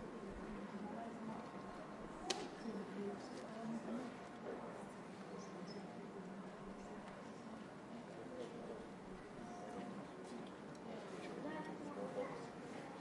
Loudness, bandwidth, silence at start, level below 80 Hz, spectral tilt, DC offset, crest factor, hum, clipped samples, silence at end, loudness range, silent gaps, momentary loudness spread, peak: -50 LUFS; 11.5 kHz; 0 s; -72 dBFS; -5 dB/octave; under 0.1%; 26 dB; none; under 0.1%; 0 s; 4 LU; none; 7 LU; -22 dBFS